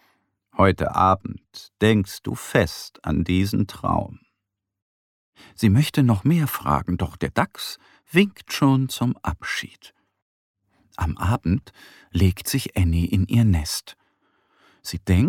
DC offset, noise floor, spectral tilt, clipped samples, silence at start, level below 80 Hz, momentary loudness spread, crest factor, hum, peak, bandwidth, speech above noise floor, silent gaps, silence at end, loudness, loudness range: under 0.1%; -81 dBFS; -6 dB/octave; under 0.1%; 0.55 s; -40 dBFS; 13 LU; 18 dB; none; -4 dBFS; 17.5 kHz; 60 dB; 4.82-5.33 s, 10.22-10.54 s; 0 s; -22 LUFS; 4 LU